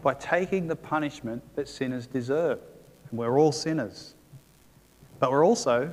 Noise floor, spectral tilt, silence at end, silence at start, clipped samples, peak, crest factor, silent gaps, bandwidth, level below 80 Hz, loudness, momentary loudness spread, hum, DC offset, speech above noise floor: -58 dBFS; -5.5 dB/octave; 0 s; 0 s; under 0.1%; -8 dBFS; 20 dB; none; 15.5 kHz; -62 dBFS; -27 LUFS; 14 LU; none; under 0.1%; 31 dB